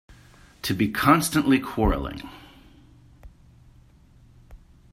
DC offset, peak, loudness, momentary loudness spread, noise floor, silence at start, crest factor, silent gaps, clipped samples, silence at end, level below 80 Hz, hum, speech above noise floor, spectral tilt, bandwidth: under 0.1%; -2 dBFS; -23 LUFS; 16 LU; -54 dBFS; 0.65 s; 24 dB; none; under 0.1%; 0.35 s; -40 dBFS; none; 31 dB; -5 dB/octave; 16 kHz